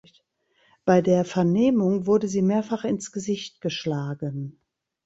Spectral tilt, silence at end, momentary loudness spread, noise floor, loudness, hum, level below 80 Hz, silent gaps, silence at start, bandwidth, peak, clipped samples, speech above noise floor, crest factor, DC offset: -6.5 dB/octave; 0.55 s; 11 LU; -66 dBFS; -24 LUFS; none; -62 dBFS; none; 0.85 s; 8 kHz; -6 dBFS; under 0.1%; 43 dB; 20 dB; under 0.1%